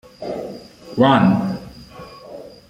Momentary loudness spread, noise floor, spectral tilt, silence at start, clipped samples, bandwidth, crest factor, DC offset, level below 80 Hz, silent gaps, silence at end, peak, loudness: 25 LU; -39 dBFS; -7.5 dB/octave; 0.2 s; under 0.1%; 10 kHz; 20 dB; under 0.1%; -52 dBFS; none; 0.2 s; -2 dBFS; -18 LUFS